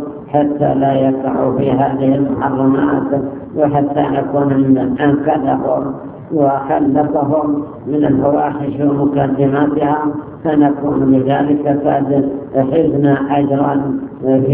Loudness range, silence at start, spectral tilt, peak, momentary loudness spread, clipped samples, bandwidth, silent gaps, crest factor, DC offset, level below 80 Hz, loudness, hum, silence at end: 1 LU; 0 s; -12.5 dB/octave; 0 dBFS; 6 LU; under 0.1%; 3.6 kHz; none; 14 dB; under 0.1%; -44 dBFS; -15 LUFS; none; 0 s